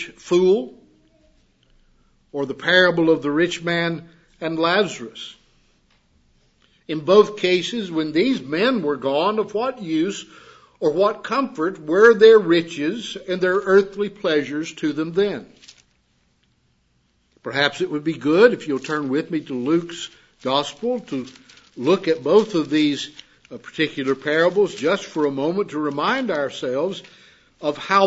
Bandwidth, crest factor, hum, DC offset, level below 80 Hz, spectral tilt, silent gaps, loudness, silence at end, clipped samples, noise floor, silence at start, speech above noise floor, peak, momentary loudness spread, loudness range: 8 kHz; 20 dB; none; under 0.1%; -62 dBFS; -5 dB/octave; none; -20 LUFS; 0 s; under 0.1%; -64 dBFS; 0 s; 45 dB; 0 dBFS; 15 LU; 8 LU